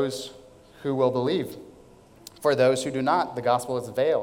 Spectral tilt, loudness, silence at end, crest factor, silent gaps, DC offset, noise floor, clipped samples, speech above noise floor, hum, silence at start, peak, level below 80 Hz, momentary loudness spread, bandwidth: -5 dB/octave; -25 LUFS; 0 s; 18 dB; none; under 0.1%; -52 dBFS; under 0.1%; 27 dB; none; 0 s; -8 dBFS; -64 dBFS; 14 LU; 17 kHz